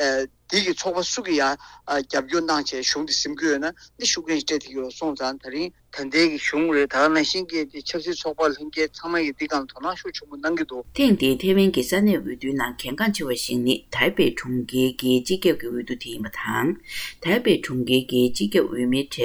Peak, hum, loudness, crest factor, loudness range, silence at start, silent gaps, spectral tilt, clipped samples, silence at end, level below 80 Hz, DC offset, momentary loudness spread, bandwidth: -4 dBFS; none; -23 LUFS; 18 dB; 3 LU; 0 s; none; -4 dB/octave; under 0.1%; 0 s; -52 dBFS; under 0.1%; 10 LU; over 20 kHz